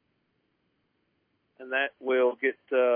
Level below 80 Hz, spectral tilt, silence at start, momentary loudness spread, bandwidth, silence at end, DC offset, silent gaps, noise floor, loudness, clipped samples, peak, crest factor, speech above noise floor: -88 dBFS; -6 dB/octave; 1.6 s; 5 LU; 3.6 kHz; 0 s; under 0.1%; none; -75 dBFS; -27 LUFS; under 0.1%; -14 dBFS; 16 dB; 48 dB